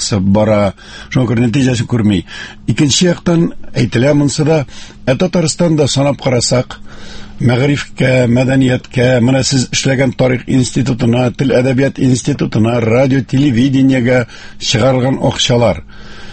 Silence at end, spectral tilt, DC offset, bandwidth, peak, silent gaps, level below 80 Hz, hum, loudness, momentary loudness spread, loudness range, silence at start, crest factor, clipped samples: 0 s; -5.5 dB/octave; under 0.1%; 8.8 kHz; 0 dBFS; none; -36 dBFS; none; -12 LUFS; 7 LU; 2 LU; 0 s; 12 dB; under 0.1%